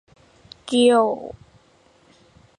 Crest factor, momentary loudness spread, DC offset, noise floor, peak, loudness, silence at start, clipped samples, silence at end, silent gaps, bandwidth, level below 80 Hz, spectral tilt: 18 dB; 23 LU; under 0.1%; -57 dBFS; -4 dBFS; -19 LUFS; 0.65 s; under 0.1%; 1.25 s; none; 11 kHz; -60 dBFS; -4 dB/octave